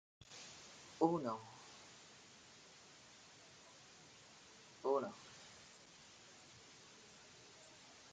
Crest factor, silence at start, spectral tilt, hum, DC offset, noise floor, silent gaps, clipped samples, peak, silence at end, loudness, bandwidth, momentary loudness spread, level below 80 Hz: 28 dB; 0.3 s; -5 dB/octave; none; under 0.1%; -62 dBFS; none; under 0.1%; -20 dBFS; 0 s; -44 LUFS; 9.6 kHz; 20 LU; -84 dBFS